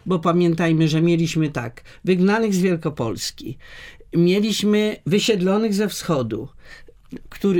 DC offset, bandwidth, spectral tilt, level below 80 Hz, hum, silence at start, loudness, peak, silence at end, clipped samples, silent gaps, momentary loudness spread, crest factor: under 0.1%; 17.5 kHz; -6 dB/octave; -50 dBFS; none; 0.05 s; -20 LUFS; -4 dBFS; 0 s; under 0.1%; none; 18 LU; 16 dB